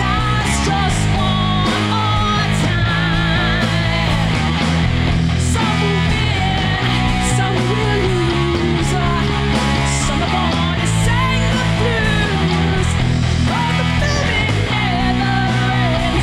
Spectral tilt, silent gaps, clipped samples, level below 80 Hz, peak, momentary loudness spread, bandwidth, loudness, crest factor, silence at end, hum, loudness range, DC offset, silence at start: -5 dB/octave; none; under 0.1%; -26 dBFS; -6 dBFS; 1 LU; 13 kHz; -16 LUFS; 10 dB; 0 s; none; 0 LU; under 0.1%; 0 s